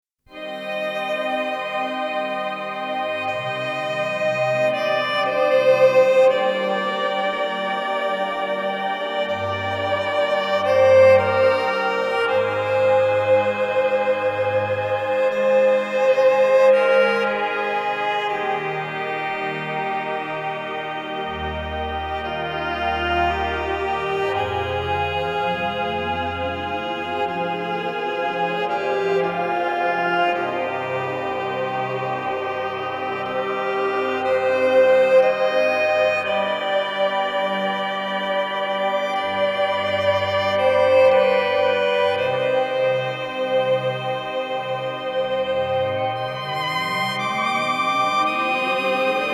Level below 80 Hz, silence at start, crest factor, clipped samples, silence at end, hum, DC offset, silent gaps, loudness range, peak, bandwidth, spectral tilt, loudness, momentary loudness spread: -48 dBFS; 0.3 s; 16 dB; under 0.1%; 0 s; none; under 0.1%; none; 6 LU; -4 dBFS; 12 kHz; -5 dB/octave; -21 LUFS; 10 LU